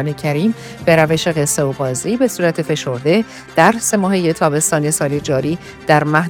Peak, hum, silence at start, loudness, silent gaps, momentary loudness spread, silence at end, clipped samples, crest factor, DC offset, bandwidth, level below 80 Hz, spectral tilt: 0 dBFS; none; 0 s; -16 LUFS; none; 7 LU; 0 s; under 0.1%; 16 dB; under 0.1%; 19.5 kHz; -48 dBFS; -4.5 dB/octave